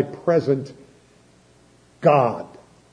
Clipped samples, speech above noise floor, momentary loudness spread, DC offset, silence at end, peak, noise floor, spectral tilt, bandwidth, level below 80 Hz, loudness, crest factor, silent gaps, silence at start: under 0.1%; 35 dB; 20 LU; under 0.1%; 0.45 s; -4 dBFS; -54 dBFS; -8 dB/octave; 10 kHz; -64 dBFS; -20 LUFS; 20 dB; none; 0 s